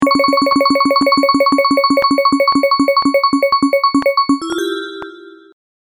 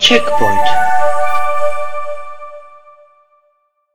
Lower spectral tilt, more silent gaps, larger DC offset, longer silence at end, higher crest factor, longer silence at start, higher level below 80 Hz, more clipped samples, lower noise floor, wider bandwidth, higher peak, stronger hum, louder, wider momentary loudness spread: about the same, -4 dB/octave vs -3 dB/octave; neither; neither; first, 0.65 s vs 0 s; about the same, 12 dB vs 14 dB; about the same, 0 s vs 0 s; second, -52 dBFS vs -42 dBFS; neither; second, -35 dBFS vs -60 dBFS; about the same, 20 kHz vs over 20 kHz; about the same, 0 dBFS vs 0 dBFS; neither; about the same, -13 LUFS vs -15 LUFS; second, 8 LU vs 20 LU